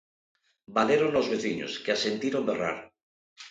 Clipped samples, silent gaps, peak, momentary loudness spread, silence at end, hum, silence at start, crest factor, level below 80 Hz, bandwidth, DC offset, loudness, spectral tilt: under 0.1%; 3.03-3.36 s; -8 dBFS; 9 LU; 0 s; none; 0.7 s; 20 dB; -68 dBFS; 9.2 kHz; under 0.1%; -28 LUFS; -4.5 dB/octave